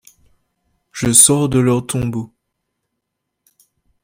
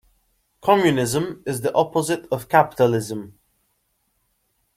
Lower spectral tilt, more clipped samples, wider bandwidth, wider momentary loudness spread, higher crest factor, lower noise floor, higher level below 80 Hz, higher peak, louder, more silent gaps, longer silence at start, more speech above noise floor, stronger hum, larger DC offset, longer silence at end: about the same, -4 dB/octave vs -5 dB/octave; neither; about the same, 16.5 kHz vs 16 kHz; first, 22 LU vs 10 LU; about the same, 18 dB vs 20 dB; first, -77 dBFS vs -70 dBFS; first, -46 dBFS vs -58 dBFS; about the same, 0 dBFS vs -2 dBFS; first, -13 LUFS vs -21 LUFS; neither; first, 0.95 s vs 0.65 s; first, 62 dB vs 49 dB; neither; neither; first, 1.75 s vs 1.45 s